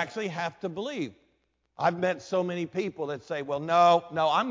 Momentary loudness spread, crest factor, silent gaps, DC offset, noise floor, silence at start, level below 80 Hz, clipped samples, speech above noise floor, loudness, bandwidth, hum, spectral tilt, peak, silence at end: 12 LU; 18 dB; none; under 0.1%; -73 dBFS; 0 s; -70 dBFS; under 0.1%; 46 dB; -28 LUFS; 7.6 kHz; none; -5.5 dB/octave; -10 dBFS; 0 s